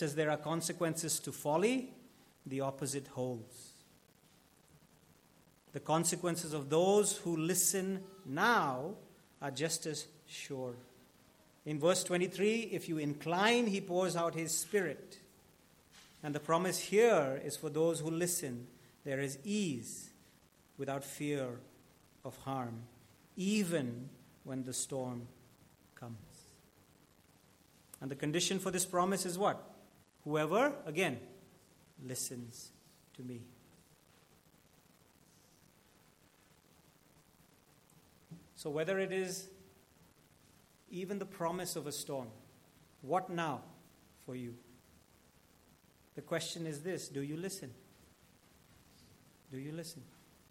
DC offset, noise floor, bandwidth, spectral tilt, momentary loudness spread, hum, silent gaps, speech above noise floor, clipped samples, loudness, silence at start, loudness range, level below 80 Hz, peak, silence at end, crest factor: under 0.1%; -67 dBFS; 16.5 kHz; -4 dB/octave; 21 LU; none; none; 31 dB; under 0.1%; -36 LUFS; 0 s; 12 LU; -78 dBFS; -16 dBFS; 0.45 s; 24 dB